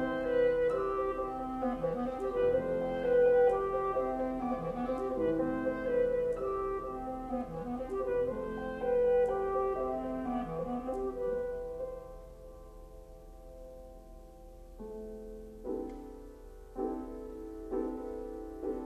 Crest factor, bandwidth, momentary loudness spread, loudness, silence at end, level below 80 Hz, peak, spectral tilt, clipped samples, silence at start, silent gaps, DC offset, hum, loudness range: 16 dB; 8.4 kHz; 23 LU; -33 LUFS; 0 s; -52 dBFS; -18 dBFS; -7.5 dB/octave; under 0.1%; 0 s; none; under 0.1%; none; 15 LU